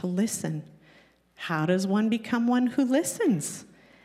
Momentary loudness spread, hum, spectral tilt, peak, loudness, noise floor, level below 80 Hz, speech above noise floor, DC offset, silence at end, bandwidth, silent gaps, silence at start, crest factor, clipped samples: 11 LU; none; -5 dB/octave; -12 dBFS; -26 LUFS; -59 dBFS; -74 dBFS; 33 dB; under 0.1%; 0.4 s; 16 kHz; none; 0 s; 16 dB; under 0.1%